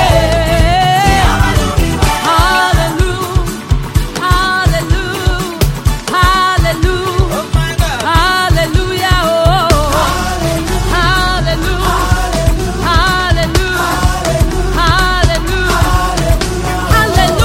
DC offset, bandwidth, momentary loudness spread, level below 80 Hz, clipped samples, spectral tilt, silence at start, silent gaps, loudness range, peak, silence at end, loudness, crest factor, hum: under 0.1%; 16.5 kHz; 5 LU; -16 dBFS; under 0.1%; -4.5 dB/octave; 0 s; none; 2 LU; 0 dBFS; 0 s; -12 LUFS; 12 dB; none